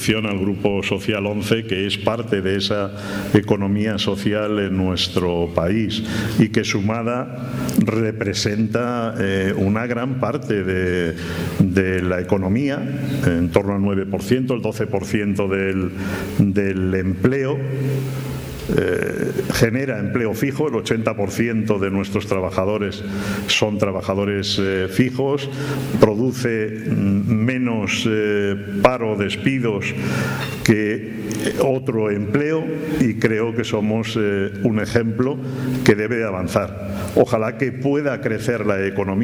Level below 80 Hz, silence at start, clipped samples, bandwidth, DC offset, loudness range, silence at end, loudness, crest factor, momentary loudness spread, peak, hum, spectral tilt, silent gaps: -46 dBFS; 0 s; under 0.1%; over 20 kHz; under 0.1%; 1 LU; 0 s; -20 LUFS; 20 dB; 5 LU; 0 dBFS; none; -6 dB/octave; none